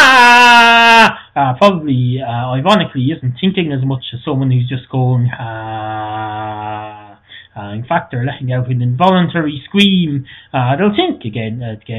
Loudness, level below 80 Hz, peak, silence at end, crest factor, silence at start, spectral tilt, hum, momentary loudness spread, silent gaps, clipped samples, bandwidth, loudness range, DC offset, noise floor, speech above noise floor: -12 LUFS; -48 dBFS; 0 dBFS; 0 s; 12 dB; 0 s; -5.5 dB/octave; none; 18 LU; none; 0.4%; 15.5 kHz; 11 LU; under 0.1%; -39 dBFS; 24 dB